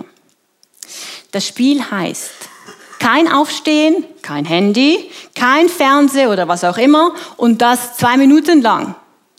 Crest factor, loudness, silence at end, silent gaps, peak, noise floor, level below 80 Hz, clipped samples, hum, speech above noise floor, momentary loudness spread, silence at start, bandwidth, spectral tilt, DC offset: 14 dB; -13 LUFS; 0.45 s; none; 0 dBFS; -57 dBFS; -68 dBFS; under 0.1%; none; 44 dB; 17 LU; 0.9 s; 15.5 kHz; -4 dB/octave; under 0.1%